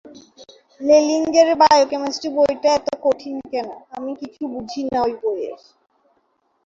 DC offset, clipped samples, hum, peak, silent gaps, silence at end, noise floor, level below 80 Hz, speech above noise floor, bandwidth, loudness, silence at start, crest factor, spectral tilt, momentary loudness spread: under 0.1%; under 0.1%; none; 0 dBFS; none; 1.1 s; -66 dBFS; -58 dBFS; 47 dB; 7.8 kHz; -18 LUFS; 0.05 s; 18 dB; -3.5 dB/octave; 16 LU